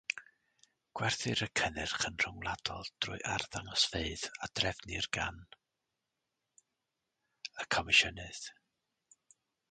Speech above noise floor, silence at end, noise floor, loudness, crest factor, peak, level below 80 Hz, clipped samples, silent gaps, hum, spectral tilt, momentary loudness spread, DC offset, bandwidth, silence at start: 51 dB; 1.2 s; -87 dBFS; -34 LUFS; 24 dB; -14 dBFS; -58 dBFS; under 0.1%; none; none; -2 dB/octave; 17 LU; under 0.1%; 9.6 kHz; 0.1 s